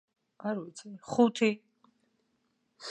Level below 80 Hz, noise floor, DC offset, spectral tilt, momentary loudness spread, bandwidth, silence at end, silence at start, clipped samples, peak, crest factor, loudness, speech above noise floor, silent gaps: -80 dBFS; -76 dBFS; under 0.1%; -5 dB/octave; 20 LU; 9.4 kHz; 0 s; 0.45 s; under 0.1%; -10 dBFS; 22 dB; -30 LUFS; 47 dB; none